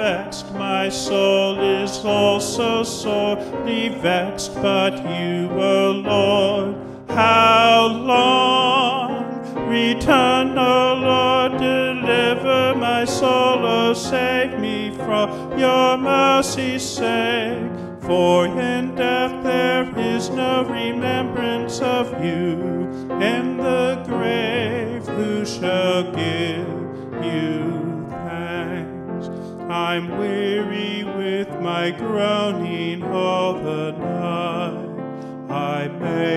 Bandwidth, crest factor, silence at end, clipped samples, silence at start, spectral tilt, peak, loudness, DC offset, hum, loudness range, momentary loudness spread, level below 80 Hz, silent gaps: 13.5 kHz; 18 dB; 0 s; under 0.1%; 0 s; -4.5 dB/octave; -2 dBFS; -19 LUFS; under 0.1%; none; 8 LU; 11 LU; -52 dBFS; none